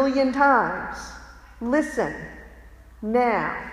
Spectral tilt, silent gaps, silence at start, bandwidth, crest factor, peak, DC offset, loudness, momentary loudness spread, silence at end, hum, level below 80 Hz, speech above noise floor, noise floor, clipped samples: -5.5 dB/octave; none; 0 s; 13 kHz; 18 dB; -6 dBFS; under 0.1%; -23 LUFS; 21 LU; 0 s; none; -48 dBFS; 24 dB; -46 dBFS; under 0.1%